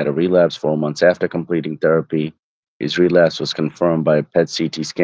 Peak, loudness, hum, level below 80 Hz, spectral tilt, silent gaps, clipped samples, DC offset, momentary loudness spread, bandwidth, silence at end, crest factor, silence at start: 0 dBFS; -17 LUFS; none; -56 dBFS; -6 dB/octave; 2.39-2.80 s; under 0.1%; under 0.1%; 8 LU; 8 kHz; 0 s; 18 dB; 0 s